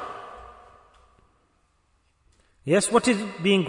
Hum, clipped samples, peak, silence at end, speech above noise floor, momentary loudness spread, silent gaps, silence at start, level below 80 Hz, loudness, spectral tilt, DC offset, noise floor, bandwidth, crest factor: none; under 0.1%; -6 dBFS; 0 s; 45 dB; 24 LU; none; 0 s; -60 dBFS; -23 LUFS; -4.5 dB/octave; under 0.1%; -67 dBFS; 11 kHz; 22 dB